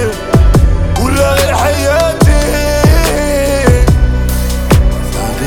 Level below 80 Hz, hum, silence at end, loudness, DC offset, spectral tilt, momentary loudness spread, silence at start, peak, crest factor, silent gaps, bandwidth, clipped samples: -12 dBFS; none; 0 s; -11 LUFS; under 0.1%; -5.5 dB/octave; 5 LU; 0 s; 0 dBFS; 10 dB; none; 18.5 kHz; under 0.1%